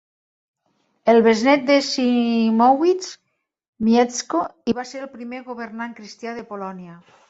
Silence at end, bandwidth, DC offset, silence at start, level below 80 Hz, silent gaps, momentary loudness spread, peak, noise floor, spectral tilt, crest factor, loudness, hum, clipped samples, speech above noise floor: 0.35 s; 8 kHz; under 0.1%; 1.05 s; -64 dBFS; 3.68-3.73 s; 17 LU; -4 dBFS; -68 dBFS; -4.5 dB/octave; 18 dB; -18 LUFS; none; under 0.1%; 48 dB